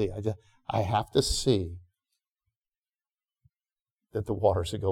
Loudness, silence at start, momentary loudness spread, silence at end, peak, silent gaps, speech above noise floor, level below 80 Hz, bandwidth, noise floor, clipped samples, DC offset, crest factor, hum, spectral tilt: -29 LUFS; 0 s; 13 LU; 0 s; -10 dBFS; 2.31-2.36 s, 2.56-2.61 s, 3.91-3.97 s; over 62 dB; -46 dBFS; 17 kHz; under -90 dBFS; under 0.1%; under 0.1%; 20 dB; none; -5.5 dB/octave